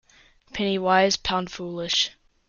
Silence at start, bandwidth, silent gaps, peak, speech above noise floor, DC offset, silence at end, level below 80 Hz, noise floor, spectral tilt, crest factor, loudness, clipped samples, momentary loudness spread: 0.55 s; 7.4 kHz; none; -6 dBFS; 33 dB; under 0.1%; 0.4 s; -52 dBFS; -56 dBFS; -3 dB/octave; 18 dB; -23 LUFS; under 0.1%; 12 LU